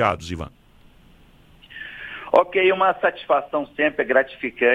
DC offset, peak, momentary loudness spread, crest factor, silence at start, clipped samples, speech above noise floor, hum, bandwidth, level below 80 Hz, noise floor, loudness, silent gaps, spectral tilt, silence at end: under 0.1%; -2 dBFS; 18 LU; 20 dB; 0 s; under 0.1%; 31 dB; none; 10.5 kHz; -50 dBFS; -51 dBFS; -20 LUFS; none; -5.5 dB/octave; 0 s